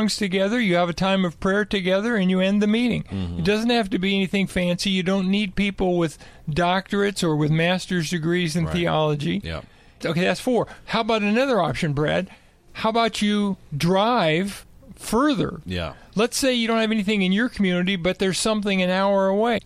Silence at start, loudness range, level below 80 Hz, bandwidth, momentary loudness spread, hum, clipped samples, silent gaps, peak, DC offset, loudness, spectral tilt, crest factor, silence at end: 0 s; 2 LU; -46 dBFS; 14.5 kHz; 7 LU; none; under 0.1%; none; -8 dBFS; under 0.1%; -22 LUFS; -5.5 dB/octave; 14 dB; 0.05 s